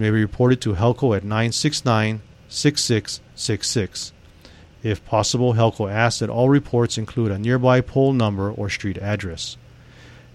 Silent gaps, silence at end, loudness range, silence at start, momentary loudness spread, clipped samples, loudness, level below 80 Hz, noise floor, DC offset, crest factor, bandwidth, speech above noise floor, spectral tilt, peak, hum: none; 0.3 s; 4 LU; 0 s; 11 LU; under 0.1%; -21 LUFS; -46 dBFS; -46 dBFS; under 0.1%; 18 dB; 13 kHz; 26 dB; -5.5 dB/octave; -2 dBFS; none